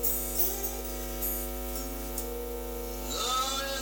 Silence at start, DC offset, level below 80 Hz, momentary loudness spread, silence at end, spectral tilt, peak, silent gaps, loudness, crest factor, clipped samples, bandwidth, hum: 0 s; under 0.1%; -40 dBFS; 10 LU; 0 s; -2.5 dB/octave; -14 dBFS; none; -31 LUFS; 18 dB; under 0.1%; over 20 kHz; 50 Hz at -40 dBFS